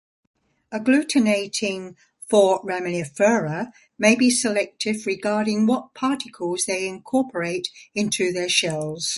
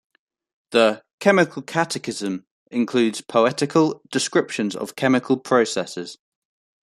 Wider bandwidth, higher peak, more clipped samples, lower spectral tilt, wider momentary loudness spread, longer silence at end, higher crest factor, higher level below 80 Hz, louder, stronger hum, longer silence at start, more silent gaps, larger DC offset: second, 11.5 kHz vs 13.5 kHz; about the same, -2 dBFS vs -2 dBFS; neither; about the same, -3.5 dB/octave vs -4.5 dB/octave; about the same, 10 LU vs 10 LU; second, 0 s vs 0.7 s; about the same, 20 dB vs 20 dB; about the same, -66 dBFS vs -68 dBFS; about the same, -22 LUFS vs -21 LUFS; neither; about the same, 0.7 s vs 0.7 s; second, none vs 1.13-1.18 s, 2.51-2.66 s; neither